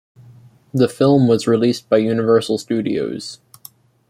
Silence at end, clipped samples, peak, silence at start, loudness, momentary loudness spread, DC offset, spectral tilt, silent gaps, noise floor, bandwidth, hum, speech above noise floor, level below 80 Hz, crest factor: 0.75 s; under 0.1%; -2 dBFS; 0.75 s; -17 LUFS; 12 LU; under 0.1%; -6.5 dB/octave; none; -46 dBFS; 15 kHz; none; 30 dB; -58 dBFS; 16 dB